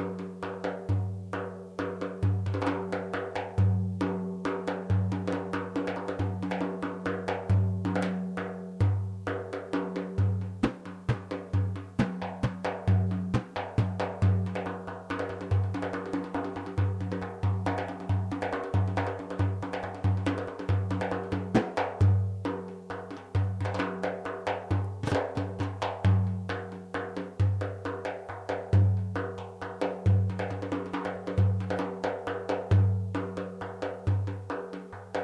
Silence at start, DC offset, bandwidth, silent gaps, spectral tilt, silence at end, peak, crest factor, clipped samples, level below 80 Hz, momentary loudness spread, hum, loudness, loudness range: 0 s; under 0.1%; 9.4 kHz; none; -8 dB/octave; 0 s; -14 dBFS; 16 dB; under 0.1%; -52 dBFS; 9 LU; none; -31 LUFS; 2 LU